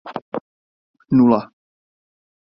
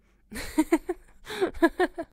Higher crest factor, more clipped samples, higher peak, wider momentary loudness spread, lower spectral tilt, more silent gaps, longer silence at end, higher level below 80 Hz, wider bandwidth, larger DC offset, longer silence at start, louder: about the same, 20 dB vs 20 dB; neither; first, -2 dBFS vs -8 dBFS; first, 17 LU vs 14 LU; first, -11 dB/octave vs -4 dB/octave; first, 0.22-0.32 s, 0.41-0.94 s vs none; first, 1.05 s vs 0.1 s; second, -58 dBFS vs -48 dBFS; second, 5.6 kHz vs 16 kHz; neither; second, 0.05 s vs 0.3 s; first, -16 LUFS vs -27 LUFS